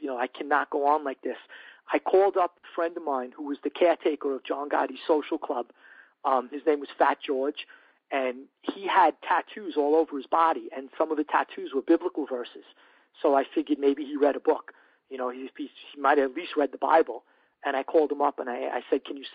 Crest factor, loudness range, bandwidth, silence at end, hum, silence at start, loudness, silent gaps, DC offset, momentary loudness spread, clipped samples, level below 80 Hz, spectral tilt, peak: 20 dB; 2 LU; 4.9 kHz; 0.05 s; none; 0 s; -27 LUFS; none; under 0.1%; 13 LU; under 0.1%; -74 dBFS; -0.5 dB/octave; -8 dBFS